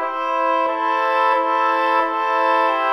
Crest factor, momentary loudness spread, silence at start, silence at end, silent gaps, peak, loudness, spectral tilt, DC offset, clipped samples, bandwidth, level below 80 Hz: 12 dB; 2 LU; 0 s; 0 s; none; -6 dBFS; -18 LUFS; -2 dB/octave; under 0.1%; under 0.1%; 13.5 kHz; -74 dBFS